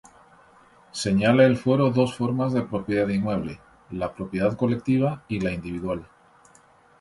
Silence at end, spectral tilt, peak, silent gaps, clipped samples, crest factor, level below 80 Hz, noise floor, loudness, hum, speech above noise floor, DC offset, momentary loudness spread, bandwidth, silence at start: 0.95 s; -7 dB/octave; -4 dBFS; none; under 0.1%; 20 dB; -52 dBFS; -56 dBFS; -24 LUFS; none; 33 dB; under 0.1%; 13 LU; 11.5 kHz; 0.95 s